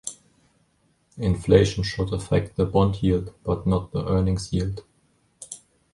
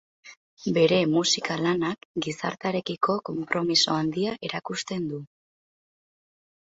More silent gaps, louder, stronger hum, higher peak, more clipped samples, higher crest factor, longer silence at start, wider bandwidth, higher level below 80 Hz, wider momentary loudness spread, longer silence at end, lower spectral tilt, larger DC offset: second, none vs 0.37-0.57 s, 2.05-2.15 s; first, -23 LUFS vs -26 LUFS; neither; first, -4 dBFS vs -8 dBFS; neither; about the same, 20 dB vs 20 dB; second, 0.05 s vs 0.25 s; first, 11.5 kHz vs 8 kHz; first, -38 dBFS vs -66 dBFS; first, 20 LU vs 10 LU; second, 0.35 s vs 1.45 s; first, -6.5 dB/octave vs -4 dB/octave; neither